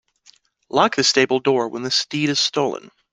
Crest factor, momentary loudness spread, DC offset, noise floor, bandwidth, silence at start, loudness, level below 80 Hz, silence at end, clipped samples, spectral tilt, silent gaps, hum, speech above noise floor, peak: 20 dB; 8 LU; under 0.1%; -55 dBFS; 10 kHz; 0.75 s; -19 LUFS; -64 dBFS; 0.25 s; under 0.1%; -3 dB/octave; none; none; 36 dB; -2 dBFS